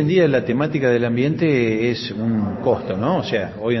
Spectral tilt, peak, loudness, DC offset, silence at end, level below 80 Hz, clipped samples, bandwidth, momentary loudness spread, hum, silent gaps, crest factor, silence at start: -6 dB/octave; -4 dBFS; -19 LUFS; under 0.1%; 0 s; -52 dBFS; under 0.1%; 6.2 kHz; 5 LU; none; none; 14 dB; 0 s